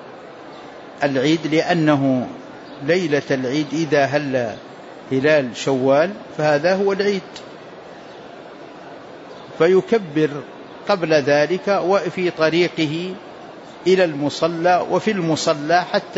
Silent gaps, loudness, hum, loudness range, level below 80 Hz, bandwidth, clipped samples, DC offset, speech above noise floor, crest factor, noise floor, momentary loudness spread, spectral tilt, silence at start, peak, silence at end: none; -19 LUFS; none; 4 LU; -64 dBFS; 8 kHz; under 0.1%; under 0.1%; 20 dB; 16 dB; -38 dBFS; 21 LU; -5.5 dB/octave; 0 s; -4 dBFS; 0 s